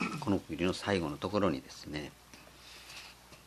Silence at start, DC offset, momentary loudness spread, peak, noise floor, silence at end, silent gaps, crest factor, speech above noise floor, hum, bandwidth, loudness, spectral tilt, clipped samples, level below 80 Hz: 0 s; under 0.1%; 19 LU; -14 dBFS; -55 dBFS; 0 s; none; 22 dB; 21 dB; 60 Hz at -60 dBFS; 13.5 kHz; -34 LUFS; -5.5 dB/octave; under 0.1%; -60 dBFS